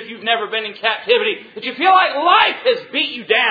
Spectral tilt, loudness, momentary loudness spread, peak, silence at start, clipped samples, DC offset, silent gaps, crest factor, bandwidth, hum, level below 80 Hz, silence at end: -4.5 dB/octave; -16 LUFS; 9 LU; 0 dBFS; 0 s; under 0.1%; under 0.1%; none; 16 dB; 5 kHz; none; -66 dBFS; 0 s